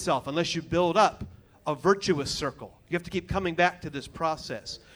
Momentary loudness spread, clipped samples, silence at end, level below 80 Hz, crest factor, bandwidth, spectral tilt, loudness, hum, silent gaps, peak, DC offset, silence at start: 14 LU; under 0.1%; 0.2 s; -52 dBFS; 20 dB; over 20 kHz; -4.5 dB/octave; -28 LUFS; none; none; -8 dBFS; under 0.1%; 0 s